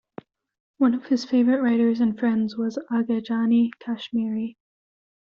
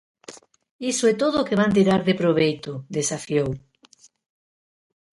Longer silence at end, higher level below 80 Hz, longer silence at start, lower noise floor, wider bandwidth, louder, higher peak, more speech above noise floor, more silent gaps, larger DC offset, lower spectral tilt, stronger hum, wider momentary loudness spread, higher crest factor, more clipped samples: second, 0.85 s vs 1.55 s; second, -68 dBFS vs -56 dBFS; first, 0.8 s vs 0.3 s; second, -45 dBFS vs -56 dBFS; second, 7 kHz vs 11.5 kHz; about the same, -23 LUFS vs -22 LUFS; about the same, -8 dBFS vs -6 dBFS; second, 23 dB vs 35 dB; second, none vs 0.71-0.79 s; neither; about the same, -5.5 dB/octave vs -5 dB/octave; neither; second, 8 LU vs 11 LU; about the same, 16 dB vs 18 dB; neither